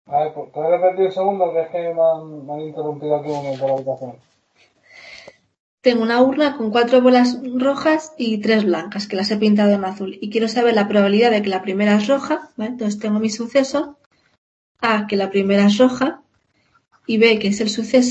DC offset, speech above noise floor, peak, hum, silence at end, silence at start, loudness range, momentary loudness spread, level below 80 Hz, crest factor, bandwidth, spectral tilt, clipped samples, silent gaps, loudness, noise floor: under 0.1%; 46 dB; -2 dBFS; none; 0 s; 0.1 s; 6 LU; 12 LU; -64 dBFS; 18 dB; 8.4 kHz; -5.5 dB/octave; under 0.1%; 5.60-5.78 s, 14.06-14.11 s, 14.38-14.75 s; -18 LUFS; -63 dBFS